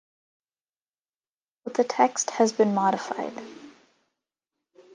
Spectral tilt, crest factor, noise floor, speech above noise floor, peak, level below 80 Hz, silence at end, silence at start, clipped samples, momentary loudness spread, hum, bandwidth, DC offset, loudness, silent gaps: -4 dB/octave; 22 dB; under -90 dBFS; over 66 dB; -6 dBFS; -78 dBFS; 1.25 s; 1.65 s; under 0.1%; 18 LU; none; 10.5 kHz; under 0.1%; -25 LUFS; none